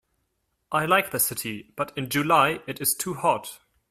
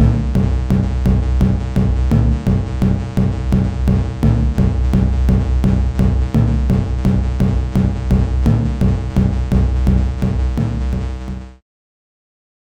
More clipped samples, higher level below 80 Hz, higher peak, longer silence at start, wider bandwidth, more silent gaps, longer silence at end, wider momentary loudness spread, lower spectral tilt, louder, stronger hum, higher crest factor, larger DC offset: neither; second, -64 dBFS vs -18 dBFS; second, -6 dBFS vs -2 dBFS; first, 0.7 s vs 0 s; first, 16 kHz vs 8.4 kHz; neither; second, 0.35 s vs 1.15 s; first, 11 LU vs 3 LU; second, -3 dB/octave vs -9 dB/octave; second, -24 LUFS vs -17 LUFS; neither; first, 20 dB vs 14 dB; neither